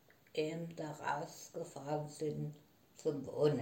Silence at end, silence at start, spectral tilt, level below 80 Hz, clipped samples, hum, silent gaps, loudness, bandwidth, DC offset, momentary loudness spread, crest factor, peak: 0 s; 0.35 s; -6 dB/octave; -80 dBFS; under 0.1%; none; none; -41 LUFS; 16.5 kHz; under 0.1%; 9 LU; 20 dB; -20 dBFS